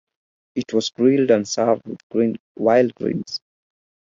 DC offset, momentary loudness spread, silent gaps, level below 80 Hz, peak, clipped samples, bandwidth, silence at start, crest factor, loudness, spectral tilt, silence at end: under 0.1%; 12 LU; 2.03-2.10 s, 2.40-2.55 s; -64 dBFS; -4 dBFS; under 0.1%; 7.6 kHz; 0.55 s; 18 dB; -20 LUFS; -5 dB/octave; 0.8 s